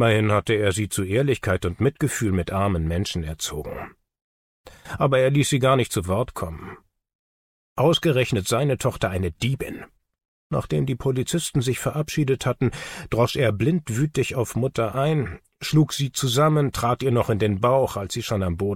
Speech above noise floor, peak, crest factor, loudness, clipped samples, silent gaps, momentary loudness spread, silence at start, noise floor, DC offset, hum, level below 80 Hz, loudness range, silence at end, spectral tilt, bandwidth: over 68 dB; -6 dBFS; 16 dB; -23 LUFS; under 0.1%; 4.22-4.64 s, 7.15-7.76 s, 10.25-10.50 s; 10 LU; 0 s; under -90 dBFS; under 0.1%; none; -44 dBFS; 4 LU; 0 s; -5.5 dB/octave; 16.5 kHz